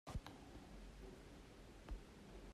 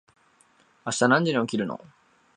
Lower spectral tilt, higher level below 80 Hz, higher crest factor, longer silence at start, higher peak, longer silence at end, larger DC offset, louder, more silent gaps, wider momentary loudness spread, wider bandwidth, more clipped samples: about the same, -5.5 dB/octave vs -4.5 dB/octave; first, -58 dBFS vs -72 dBFS; about the same, 20 dB vs 22 dB; second, 0.05 s vs 0.85 s; second, -36 dBFS vs -4 dBFS; second, 0 s vs 0.6 s; neither; second, -58 LUFS vs -24 LUFS; neither; second, 7 LU vs 16 LU; first, 13.5 kHz vs 11 kHz; neither